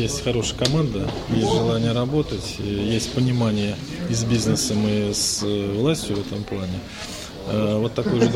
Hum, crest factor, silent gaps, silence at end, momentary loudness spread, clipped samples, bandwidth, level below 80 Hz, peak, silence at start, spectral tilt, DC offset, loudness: none; 18 dB; none; 0 s; 8 LU; under 0.1%; 16 kHz; -40 dBFS; -4 dBFS; 0 s; -5 dB/octave; under 0.1%; -23 LUFS